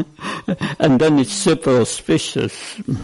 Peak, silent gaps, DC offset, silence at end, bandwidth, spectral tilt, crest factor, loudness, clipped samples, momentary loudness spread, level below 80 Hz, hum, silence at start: -2 dBFS; none; under 0.1%; 0 s; 11.5 kHz; -5 dB/octave; 16 dB; -18 LUFS; under 0.1%; 11 LU; -48 dBFS; none; 0 s